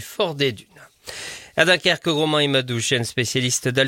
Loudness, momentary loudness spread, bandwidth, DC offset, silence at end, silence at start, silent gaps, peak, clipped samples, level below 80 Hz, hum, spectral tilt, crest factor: -20 LUFS; 16 LU; 17 kHz; under 0.1%; 0 s; 0 s; none; 0 dBFS; under 0.1%; -58 dBFS; none; -3.5 dB/octave; 22 dB